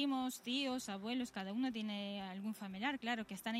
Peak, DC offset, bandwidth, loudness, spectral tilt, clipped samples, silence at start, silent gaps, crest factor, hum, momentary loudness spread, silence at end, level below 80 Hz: -24 dBFS; under 0.1%; 16 kHz; -41 LUFS; -4 dB/octave; under 0.1%; 0 s; none; 16 dB; none; 6 LU; 0 s; -78 dBFS